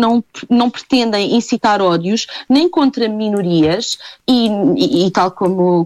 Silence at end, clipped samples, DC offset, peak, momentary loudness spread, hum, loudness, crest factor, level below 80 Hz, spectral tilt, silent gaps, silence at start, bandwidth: 0 s; under 0.1%; under 0.1%; -2 dBFS; 5 LU; none; -15 LUFS; 12 dB; -52 dBFS; -5.5 dB/octave; none; 0 s; 12.5 kHz